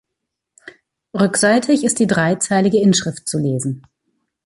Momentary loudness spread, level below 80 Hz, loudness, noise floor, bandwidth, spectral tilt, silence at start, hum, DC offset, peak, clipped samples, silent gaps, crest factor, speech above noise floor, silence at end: 10 LU; -58 dBFS; -16 LUFS; -79 dBFS; 11.5 kHz; -4.5 dB/octave; 0.65 s; none; under 0.1%; -2 dBFS; under 0.1%; none; 16 dB; 63 dB; 0.65 s